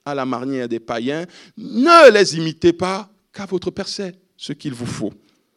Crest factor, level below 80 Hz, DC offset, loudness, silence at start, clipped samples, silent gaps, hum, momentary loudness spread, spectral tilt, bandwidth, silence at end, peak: 18 dB; -58 dBFS; under 0.1%; -16 LUFS; 0.05 s; 0.3%; none; none; 23 LU; -4.5 dB/octave; 12 kHz; 0.45 s; 0 dBFS